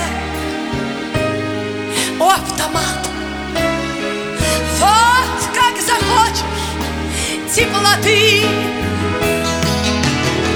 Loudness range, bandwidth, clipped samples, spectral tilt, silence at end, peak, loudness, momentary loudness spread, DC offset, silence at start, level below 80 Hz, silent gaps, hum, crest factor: 4 LU; over 20 kHz; under 0.1%; -3.5 dB/octave; 0 s; 0 dBFS; -15 LUFS; 10 LU; under 0.1%; 0 s; -32 dBFS; none; none; 16 dB